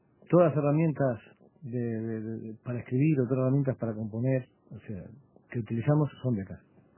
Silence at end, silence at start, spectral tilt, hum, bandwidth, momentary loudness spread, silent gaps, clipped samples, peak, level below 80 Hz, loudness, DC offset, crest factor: 0.4 s; 0.3 s; -13 dB/octave; none; 3.2 kHz; 18 LU; none; under 0.1%; -10 dBFS; -62 dBFS; -29 LUFS; under 0.1%; 20 dB